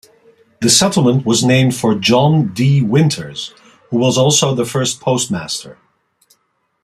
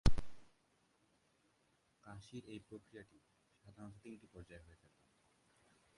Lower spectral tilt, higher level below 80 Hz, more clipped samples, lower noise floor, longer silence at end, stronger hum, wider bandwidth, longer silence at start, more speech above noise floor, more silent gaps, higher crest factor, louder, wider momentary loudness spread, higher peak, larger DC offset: second, -4.5 dB/octave vs -6 dB/octave; about the same, -52 dBFS vs -50 dBFS; neither; second, -64 dBFS vs -78 dBFS; second, 1.1 s vs 1.55 s; neither; first, 14.5 kHz vs 11 kHz; first, 0.6 s vs 0.05 s; first, 51 dB vs 21 dB; neither; second, 16 dB vs 26 dB; first, -14 LUFS vs -52 LUFS; about the same, 11 LU vs 13 LU; first, 0 dBFS vs -16 dBFS; neither